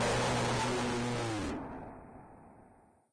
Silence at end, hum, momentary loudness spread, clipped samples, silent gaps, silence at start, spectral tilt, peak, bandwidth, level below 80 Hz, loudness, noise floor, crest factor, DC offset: 0.5 s; none; 22 LU; under 0.1%; none; 0 s; -4.5 dB/octave; -24 dBFS; 10.5 kHz; -52 dBFS; -34 LUFS; -62 dBFS; 12 dB; under 0.1%